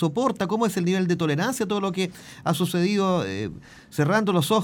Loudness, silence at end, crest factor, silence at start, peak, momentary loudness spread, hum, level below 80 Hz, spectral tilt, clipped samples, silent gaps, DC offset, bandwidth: -24 LUFS; 0 s; 16 dB; 0 s; -8 dBFS; 9 LU; none; -60 dBFS; -5.5 dB/octave; under 0.1%; none; under 0.1%; 18 kHz